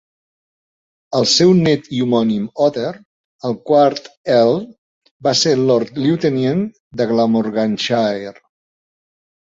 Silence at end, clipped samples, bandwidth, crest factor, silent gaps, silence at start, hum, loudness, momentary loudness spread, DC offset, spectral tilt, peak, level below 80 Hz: 1.15 s; under 0.1%; 8 kHz; 16 dB; 3.05-3.39 s, 4.17-4.24 s, 4.78-5.02 s, 5.11-5.20 s, 6.80-6.91 s; 1.1 s; none; -16 LUFS; 12 LU; under 0.1%; -5 dB/octave; -2 dBFS; -56 dBFS